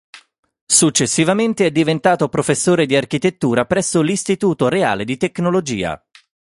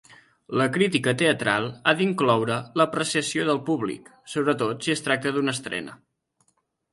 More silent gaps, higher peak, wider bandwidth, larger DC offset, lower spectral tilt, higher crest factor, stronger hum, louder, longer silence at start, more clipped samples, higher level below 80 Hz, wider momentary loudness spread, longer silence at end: first, 0.39-0.43 s, 0.61-0.67 s vs none; first, 0 dBFS vs -4 dBFS; about the same, 11.5 kHz vs 11.5 kHz; neither; about the same, -4 dB/octave vs -4.5 dB/octave; about the same, 18 dB vs 22 dB; neither; first, -16 LUFS vs -24 LUFS; about the same, 0.15 s vs 0.1 s; neither; first, -52 dBFS vs -66 dBFS; second, 6 LU vs 9 LU; second, 0.6 s vs 1 s